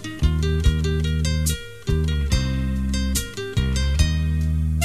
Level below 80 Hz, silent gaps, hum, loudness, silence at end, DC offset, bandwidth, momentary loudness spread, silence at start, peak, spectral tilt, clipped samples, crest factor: -24 dBFS; none; none; -23 LUFS; 0 s; 0.7%; 15.5 kHz; 4 LU; 0 s; -6 dBFS; -5 dB/octave; under 0.1%; 16 dB